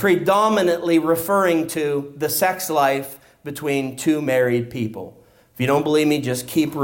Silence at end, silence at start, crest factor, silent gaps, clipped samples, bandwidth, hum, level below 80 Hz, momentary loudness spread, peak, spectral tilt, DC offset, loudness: 0 s; 0 s; 14 dB; none; under 0.1%; 17 kHz; none; -60 dBFS; 11 LU; -6 dBFS; -5 dB/octave; under 0.1%; -20 LUFS